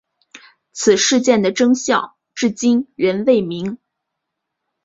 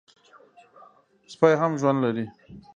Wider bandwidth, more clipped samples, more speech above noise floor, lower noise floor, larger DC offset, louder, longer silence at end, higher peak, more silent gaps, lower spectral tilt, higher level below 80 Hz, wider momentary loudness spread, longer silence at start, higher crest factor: about the same, 7.8 kHz vs 7.6 kHz; neither; first, 62 dB vs 31 dB; first, -78 dBFS vs -55 dBFS; neither; first, -16 LUFS vs -23 LUFS; first, 1.1 s vs 0.15 s; about the same, -2 dBFS vs -2 dBFS; neither; second, -3.5 dB/octave vs -7 dB/octave; first, -60 dBFS vs -66 dBFS; about the same, 14 LU vs 12 LU; second, 0.35 s vs 1.3 s; second, 16 dB vs 24 dB